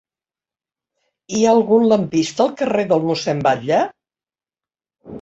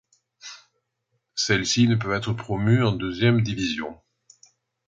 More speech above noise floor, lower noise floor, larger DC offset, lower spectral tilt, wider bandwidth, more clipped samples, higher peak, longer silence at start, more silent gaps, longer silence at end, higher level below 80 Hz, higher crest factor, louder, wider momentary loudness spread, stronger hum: first, over 74 dB vs 54 dB; first, under -90 dBFS vs -76 dBFS; neither; about the same, -5.5 dB/octave vs -5 dB/octave; about the same, 8 kHz vs 7.8 kHz; neither; first, -2 dBFS vs -6 dBFS; first, 1.3 s vs 0.45 s; neither; second, 0 s vs 0.95 s; second, -60 dBFS vs -52 dBFS; about the same, 16 dB vs 20 dB; first, -17 LUFS vs -23 LUFS; second, 6 LU vs 20 LU; neither